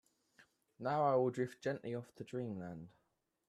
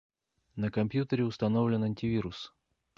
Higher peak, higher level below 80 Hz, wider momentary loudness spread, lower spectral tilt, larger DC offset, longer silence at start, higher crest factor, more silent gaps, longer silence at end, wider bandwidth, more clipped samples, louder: second, -22 dBFS vs -16 dBFS; second, -80 dBFS vs -58 dBFS; about the same, 16 LU vs 15 LU; about the same, -7.5 dB/octave vs -8.5 dB/octave; neither; first, 0.8 s vs 0.55 s; about the same, 18 dB vs 16 dB; neither; about the same, 0.6 s vs 0.5 s; first, 12.5 kHz vs 7.2 kHz; neither; second, -39 LUFS vs -31 LUFS